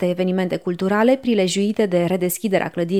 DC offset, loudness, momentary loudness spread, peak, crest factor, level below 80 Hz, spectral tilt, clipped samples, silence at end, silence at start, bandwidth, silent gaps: 0.2%; -19 LUFS; 5 LU; -4 dBFS; 16 dB; -62 dBFS; -5.5 dB/octave; under 0.1%; 0 s; 0 s; 18.5 kHz; none